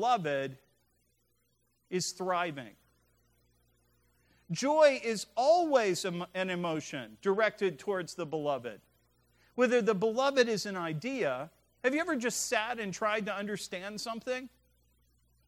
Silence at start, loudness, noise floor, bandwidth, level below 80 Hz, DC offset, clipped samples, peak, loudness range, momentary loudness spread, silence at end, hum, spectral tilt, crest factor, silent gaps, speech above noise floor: 0 s; -31 LUFS; -75 dBFS; 16 kHz; -74 dBFS; under 0.1%; under 0.1%; -12 dBFS; 9 LU; 12 LU; 1 s; 60 Hz at -70 dBFS; -4 dB/octave; 20 dB; none; 44 dB